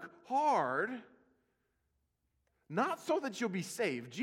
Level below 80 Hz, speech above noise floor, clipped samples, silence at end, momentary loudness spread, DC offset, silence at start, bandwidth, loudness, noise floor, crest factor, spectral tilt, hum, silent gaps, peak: -86 dBFS; 47 dB; under 0.1%; 0 s; 8 LU; under 0.1%; 0 s; 16 kHz; -35 LUFS; -81 dBFS; 18 dB; -4.5 dB/octave; none; none; -20 dBFS